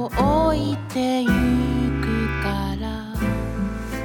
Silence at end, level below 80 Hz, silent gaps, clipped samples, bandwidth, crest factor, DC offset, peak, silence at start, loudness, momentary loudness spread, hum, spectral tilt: 0 s; -30 dBFS; none; under 0.1%; 19 kHz; 14 dB; under 0.1%; -8 dBFS; 0 s; -22 LUFS; 8 LU; none; -7 dB/octave